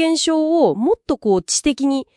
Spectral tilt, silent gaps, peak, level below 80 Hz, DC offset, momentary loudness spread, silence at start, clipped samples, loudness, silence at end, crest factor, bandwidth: -3.5 dB/octave; none; -4 dBFS; -48 dBFS; under 0.1%; 4 LU; 0 s; under 0.1%; -17 LUFS; 0.15 s; 12 dB; 12 kHz